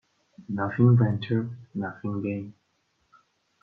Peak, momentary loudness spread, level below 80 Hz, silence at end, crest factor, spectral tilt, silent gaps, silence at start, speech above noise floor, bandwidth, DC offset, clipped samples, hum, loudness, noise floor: -10 dBFS; 15 LU; -64 dBFS; 1.1 s; 18 dB; -10.5 dB/octave; none; 0.4 s; 47 dB; 4.6 kHz; under 0.1%; under 0.1%; none; -26 LUFS; -72 dBFS